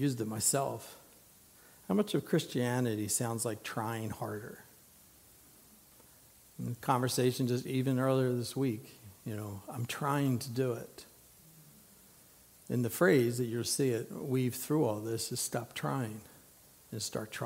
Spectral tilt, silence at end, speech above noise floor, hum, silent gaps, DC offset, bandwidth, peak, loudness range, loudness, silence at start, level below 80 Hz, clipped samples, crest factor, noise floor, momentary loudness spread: -5 dB/octave; 0 s; 27 dB; none; none; under 0.1%; 16 kHz; -14 dBFS; 6 LU; -33 LUFS; 0 s; -72 dBFS; under 0.1%; 22 dB; -60 dBFS; 14 LU